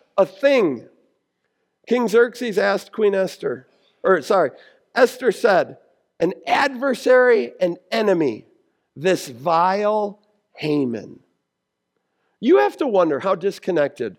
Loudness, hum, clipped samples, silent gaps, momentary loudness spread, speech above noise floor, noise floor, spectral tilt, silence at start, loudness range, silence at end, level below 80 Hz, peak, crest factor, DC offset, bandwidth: -20 LUFS; none; under 0.1%; none; 9 LU; 59 dB; -78 dBFS; -5.5 dB/octave; 0.15 s; 4 LU; 0.05 s; -74 dBFS; -2 dBFS; 18 dB; under 0.1%; 16.5 kHz